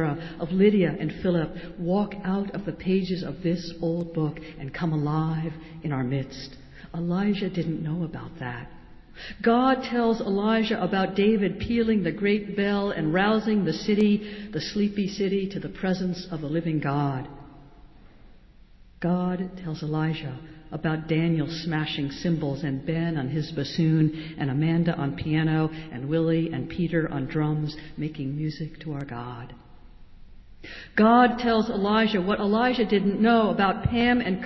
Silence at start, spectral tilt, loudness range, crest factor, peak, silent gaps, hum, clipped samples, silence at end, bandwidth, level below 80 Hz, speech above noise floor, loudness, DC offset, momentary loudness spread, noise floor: 0 s; -7.5 dB/octave; 7 LU; 18 dB; -8 dBFS; none; none; under 0.1%; 0 s; 6 kHz; -50 dBFS; 26 dB; -26 LUFS; under 0.1%; 12 LU; -51 dBFS